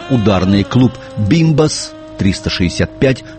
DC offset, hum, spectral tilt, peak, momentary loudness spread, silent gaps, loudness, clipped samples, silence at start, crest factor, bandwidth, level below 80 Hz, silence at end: under 0.1%; none; -6 dB/octave; 0 dBFS; 7 LU; none; -14 LUFS; under 0.1%; 0 s; 14 dB; 8.8 kHz; -34 dBFS; 0 s